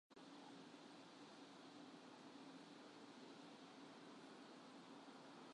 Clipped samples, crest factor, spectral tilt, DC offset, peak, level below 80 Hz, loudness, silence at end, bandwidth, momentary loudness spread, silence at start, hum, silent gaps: under 0.1%; 14 dB; -4 dB/octave; under 0.1%; -48 dBFS; under -90 dBFS; -61 LUFS; 0 s; 11 kHz; 1 LU; 0.1 s; none; none